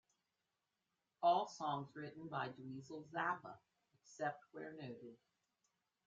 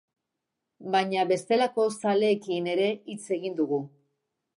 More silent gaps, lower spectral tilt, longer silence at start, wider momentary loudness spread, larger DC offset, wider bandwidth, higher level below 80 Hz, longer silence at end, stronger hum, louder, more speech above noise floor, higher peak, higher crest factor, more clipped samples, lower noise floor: neither; second, -3.5 dB/octave vs -5 dB/octave; first, 1.2 s vs 0.8 s; first, 20 LU vs 8 LU; neither; second, 7.6 kHz vs 11.5 kHz; second, -88 dBFS vs -82 dBFS; first, 0.9 s vs 0.7 s; neither; second, -44 LUFS vs -27 LUFS; second, 43 dB vs 58 dB; second, -24 dBFS vs -12 dBFS; first, 22 dB vs 16 dB; neither; first, -90 dBFS vs -84 dBFS